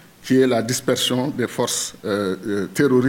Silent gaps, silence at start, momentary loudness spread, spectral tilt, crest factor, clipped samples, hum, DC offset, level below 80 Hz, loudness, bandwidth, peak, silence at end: none; 0.25 s; 6 LU; -4 dB/octave; 14 dB; under 0.1%; none; under 0.1%; -62 dBFS; -21 LUFS; 17 kHz; -6 dBFS; 0 s